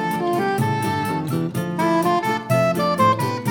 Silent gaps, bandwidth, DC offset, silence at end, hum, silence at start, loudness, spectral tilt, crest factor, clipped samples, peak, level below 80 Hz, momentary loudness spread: none; over 20 kHz; under 0.1%; 0 s; none; 0 s; -20 LUFS; -6 dB/octave; 16 dB; under 0.1%; -4 dBFS; -58 dBFS; 5 LU